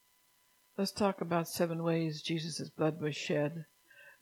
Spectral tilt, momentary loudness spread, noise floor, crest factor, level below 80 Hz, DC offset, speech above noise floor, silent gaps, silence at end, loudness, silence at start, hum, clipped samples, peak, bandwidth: -5.5 dB/octave; 7 LU; -70 dBFS; 20 dB; -74 dBFS; under 0.1%; 36 dB; none; 0.1 s; -35 LUFS; 0.8 s; none; under 0.1%; -16 dBFS; 17.5 kHz